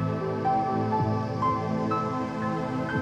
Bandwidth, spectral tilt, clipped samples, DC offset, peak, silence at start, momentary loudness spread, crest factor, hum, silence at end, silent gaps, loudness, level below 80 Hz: 9 kHz; -8 dB/octave; under 0.1%; under 0.1%; -14 dBFS; 0 s; 4 LU; 14 dB; none; 0 s; none; -27 LUFS; -54 dBFS